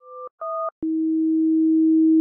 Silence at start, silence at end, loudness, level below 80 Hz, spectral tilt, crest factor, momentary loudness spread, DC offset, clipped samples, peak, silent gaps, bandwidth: 0.05 s; 0 s; -20 LUFS; -68 dBFS; -12 dB/octave; 8 dB; 14 LU; under 0.1%; under 0.1%; -12 dBFS; 0.31-0.38 s, 0.72-0.82 s; 1.5 kHz